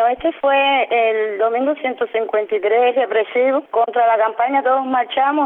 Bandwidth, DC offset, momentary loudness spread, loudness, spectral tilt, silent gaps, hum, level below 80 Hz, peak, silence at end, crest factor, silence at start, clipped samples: 4 kHz; under 0.1%; 4 LU; -17 LUFS; -6.5 dB/octave; none; none; -60 dBFS; -6 dBFS; 0 s; 12 dB; 0 s; under 0.1%